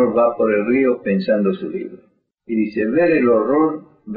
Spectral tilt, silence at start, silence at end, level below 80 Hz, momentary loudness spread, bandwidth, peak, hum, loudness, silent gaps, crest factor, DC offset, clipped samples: -6.5 dB/octave; 0 s; 0 s; -58 dBFS; 11 LU; 5 kHz; -6 dBFS; none; -18 LUFS; none; 12 dB; under 0.1%; under 0.1%